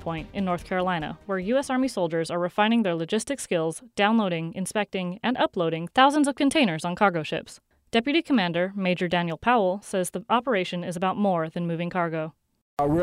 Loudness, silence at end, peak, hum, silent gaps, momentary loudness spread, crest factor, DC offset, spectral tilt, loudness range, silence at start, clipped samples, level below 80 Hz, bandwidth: -25 LUFS; 0 s; -6 dBFS; none; 12.61-12.77 s; 8 LU; 20 dB; under 0.1%; -5 dB/octave; 3 LU; 0 s; under 0.1%; -56 dBFS; 14.5 kHz